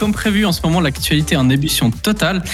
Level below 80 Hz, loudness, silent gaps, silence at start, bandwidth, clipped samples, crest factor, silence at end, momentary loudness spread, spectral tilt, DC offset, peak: -32 dBFS; -15 LUFS; none; 0 s; 16.5 kHz; under 0.1%; 12 dB; 0 s; 2 LU; -5 dB/octave; under 0.1%; -4 dBFS